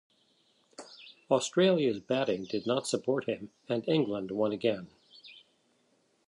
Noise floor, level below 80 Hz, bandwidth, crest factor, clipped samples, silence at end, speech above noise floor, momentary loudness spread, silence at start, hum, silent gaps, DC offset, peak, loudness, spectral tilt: -71 dBFS; -74 dBFS; 11.5 kHz; 20 dB; under 0.1%; 0.9 s; 41 dB; 25 LU; 0.8 s; none; none; under 0.1%; -12 dBFS; -30 LUFS; -5 dB/octave